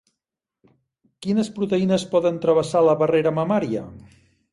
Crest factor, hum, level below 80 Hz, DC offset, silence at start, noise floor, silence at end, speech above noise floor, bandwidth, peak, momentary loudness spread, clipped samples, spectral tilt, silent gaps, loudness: 16 dB; none; -60 dBFS; under 0.1%; 1.2 s; -85 dBFS; 0.55 s; 65 dB; 11.5 kHz; -6 dBFS; 10 LU; under 0.1%; -6.5 dB/octave; none; -21 LUFS